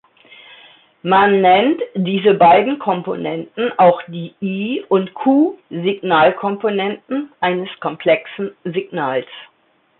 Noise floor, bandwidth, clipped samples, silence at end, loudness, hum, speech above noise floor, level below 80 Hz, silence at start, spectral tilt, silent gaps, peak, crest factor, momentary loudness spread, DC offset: -46 dBFS; 4.2 kHz; under 0.1%; 0.55 s; -16 LUFS; none; 30 dB; -62 dBFS; 1.05 s; -11 dB/octave; none; -2 dBFS; 16 dB; 13 LU; under 0.1%